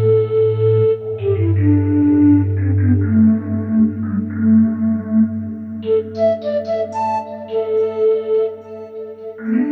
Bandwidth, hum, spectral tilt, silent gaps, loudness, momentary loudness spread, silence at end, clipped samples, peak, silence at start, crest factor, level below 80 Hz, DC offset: 5.6 kHz; none; -11 dB/octave; none; -17 LUFS; 12 LU; 0 s; under 0.1%; -4 dBFS; 0 s; 12 dB; -60 dBFS; under 0.1%